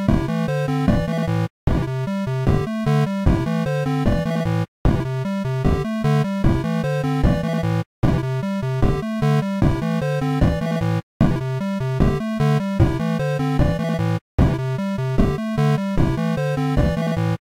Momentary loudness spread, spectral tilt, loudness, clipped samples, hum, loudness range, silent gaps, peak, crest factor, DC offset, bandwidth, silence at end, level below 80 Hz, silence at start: 4 LU; -8 dB/octave; -21 LUFS; under 0.1%; none; 1 LU; 1.50-1.67 s, 4.68-4.85 s, 7.86-8.02 s, 11.03-11.20 s, 14.21-14.38 s; -6 dBFS; 14 dB; under 0.1%; 15 kHz; 0.15 s; -28 dBFS; 0 s